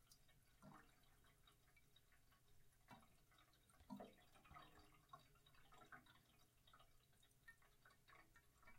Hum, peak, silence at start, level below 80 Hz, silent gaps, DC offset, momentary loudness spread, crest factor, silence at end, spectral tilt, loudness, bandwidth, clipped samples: none; -46 dBFS; 0 s; -80 dBFS; none; under 0.1%; 8 LU; 24 dB; 0 s; -4 dB/octave; -66 LUFS; 16 kHz; under 0.1%